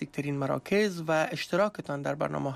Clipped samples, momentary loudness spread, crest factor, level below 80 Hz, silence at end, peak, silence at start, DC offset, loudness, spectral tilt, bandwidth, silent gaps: under 0.1%; 6 LU; 14 dB; -66 dBFS; 0 s; -16 dBFS; 0 s; under 0.1%; -29 LUFS; -6 dB/octave; 15 kHz; none